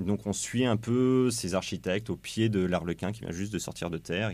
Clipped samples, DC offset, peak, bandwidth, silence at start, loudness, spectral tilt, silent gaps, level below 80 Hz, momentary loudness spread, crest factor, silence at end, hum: under 0.1%; under 0.1%; -12 dBFS; 15.5 kHz; 0 s; -30 LUFS; -5.5 dB/octave; none; -58 dBFS; 9 LU; 16 dB; 0 s; none